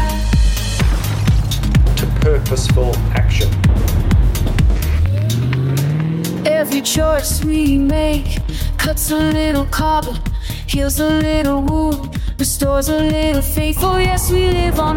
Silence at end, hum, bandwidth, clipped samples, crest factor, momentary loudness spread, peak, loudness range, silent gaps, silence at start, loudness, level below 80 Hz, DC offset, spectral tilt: 0 s; none; 17 kHz; under 0.1%; 12 dB; 4 LU; -4 dBFS; 2 LU; none; 0 s; -16 LUFS; -18 dBFS; under 0.1%; -5.5 dB/octave